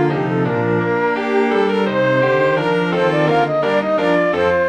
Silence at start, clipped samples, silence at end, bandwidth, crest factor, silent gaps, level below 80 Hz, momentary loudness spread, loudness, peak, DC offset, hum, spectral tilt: 0 s; under 0.1%; 0 s; 8.8 kHz; 12 dB; none; -52 dBFS; 3 LU; -16 LUFS; -4 dBFS; under 0.1%; none; -7.5 dB/octave